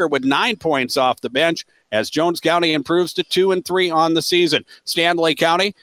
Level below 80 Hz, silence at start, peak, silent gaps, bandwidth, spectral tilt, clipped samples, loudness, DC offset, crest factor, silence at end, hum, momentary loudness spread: -62 dBFS; 0 s; -2 dBFS; none; 16.5 kHz; -4 dB/octave; under 0.1%; -18 LUFS; under 0.1%; 16 dB; 0.1 s; none; 5 LU